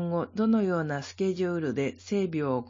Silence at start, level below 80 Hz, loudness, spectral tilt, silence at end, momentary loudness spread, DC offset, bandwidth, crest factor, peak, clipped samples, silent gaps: 0 s; -68 dBFS; -29 LUFS; -7 dB/octave; 0 s; 5 LU; under 0.1%; 7.6 kHz; 14 dB; -14 dBFS; under 0.1%; none